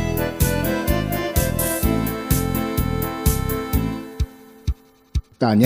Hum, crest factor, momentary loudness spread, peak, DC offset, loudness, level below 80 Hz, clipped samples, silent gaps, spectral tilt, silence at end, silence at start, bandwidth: none; 20 dB; 9 LU; 0 dBFS; under 0.1%; -22 LUFS; -28 dBFS; under 0.1%; none; -5.5 dB/octave; 0 s; 0 s; 16 kHz